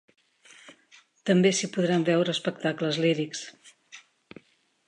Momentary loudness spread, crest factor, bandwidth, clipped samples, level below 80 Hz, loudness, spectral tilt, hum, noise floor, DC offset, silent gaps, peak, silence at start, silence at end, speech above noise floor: 14 LU; 18 dB; 11 kHz; under 0.1%; -78 dBFS; -26 LUFS; -5 dB/octave; none; -63 dBFS; under 0.1%; none; -10 dBFS; 0.7 s; 0.9 s; 38 dB